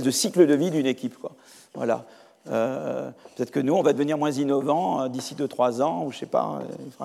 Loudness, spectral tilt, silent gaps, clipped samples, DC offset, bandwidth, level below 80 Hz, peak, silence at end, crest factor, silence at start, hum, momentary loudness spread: -25 LUFS; -5 dB/octave; none; under 0.1%; under 0.1%; 15.5 kHz; -84 dBFS; -4 dBFS; 0 s; 20 dB; 0 s; none; 14 LU